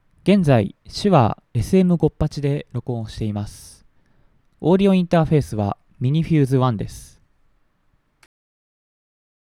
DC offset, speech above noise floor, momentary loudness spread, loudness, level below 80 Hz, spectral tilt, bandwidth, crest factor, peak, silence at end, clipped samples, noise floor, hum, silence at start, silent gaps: under 0.1%; 45 dB; 12 LU; -19 LUFS; -42 dBFS; -8 dB/octave; 12.5 kHz; 18 dB; -2 dBFS; 2.45 s; under 0.1%; -63 dBFS; none; 0.25 s; none